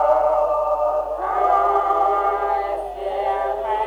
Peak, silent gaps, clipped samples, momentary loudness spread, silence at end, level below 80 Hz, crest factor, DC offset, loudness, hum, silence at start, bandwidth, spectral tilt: -4 dBFS; none; under 0.1%; 6 LU; 0 s; -46 dBFS; 16 dB; under 0.1%; -20 LUFS; none; 0 s; 10.5 kHz; -5.5 dB/octave